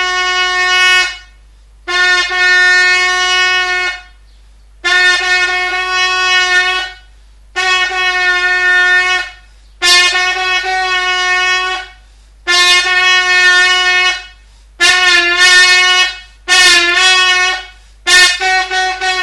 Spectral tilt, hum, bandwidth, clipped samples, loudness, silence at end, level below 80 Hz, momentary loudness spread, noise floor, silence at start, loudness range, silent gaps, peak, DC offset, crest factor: 1 dB/octave; none; 18.5 kHz; 0.1%; -9 LUFS; 0 s; -40 dBFS; 11 LU; -41 dBFS; 0 s; 4 LU; none; 0 dBFS; under 0.1%; 12 dB